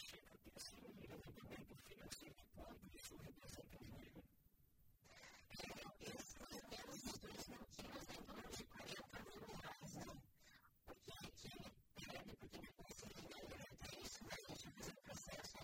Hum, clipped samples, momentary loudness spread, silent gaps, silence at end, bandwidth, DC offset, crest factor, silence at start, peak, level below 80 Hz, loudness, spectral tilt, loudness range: none; under 0.1%; 9 LU; none; 0 s; 16 kHz; under 0.1%; 22 dB; 0 s; -36 dBFS; -70 dBFS; -57 LUFS; -3.5 dB/octave; 5 LU